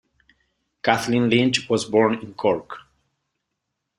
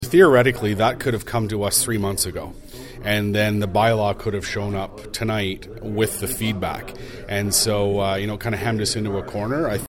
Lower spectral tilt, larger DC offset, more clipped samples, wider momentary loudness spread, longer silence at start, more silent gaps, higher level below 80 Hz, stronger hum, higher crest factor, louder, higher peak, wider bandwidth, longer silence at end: about the same, -5 dB/octave vs -4.5 dB/octave; neither; neither; second, 9 LU vs 12 LU; first, 0.85 s vs 0 s; neither; second, -60 dBFS vs -42 dBFS; neither; about the same, 22 dB vs 20 dB; about the same, -21 LUFS vs -21 LUFS; about the same, -2 dBFS vs -2 dBFS; second, 14.5 kHz vs 17 kHz; first, 1.2 s vs 0 s